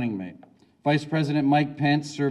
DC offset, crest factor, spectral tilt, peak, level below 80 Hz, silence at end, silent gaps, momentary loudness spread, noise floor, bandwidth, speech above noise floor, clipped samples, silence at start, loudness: under 0.1%; 16 dB; -7 dB/octave; -10 dBFS; -70 dBFS; 0 s; none; 10 LU; -53 dBFS; 11 kHz; 31 dB; under 0.1%; 0 s; -24 LUFS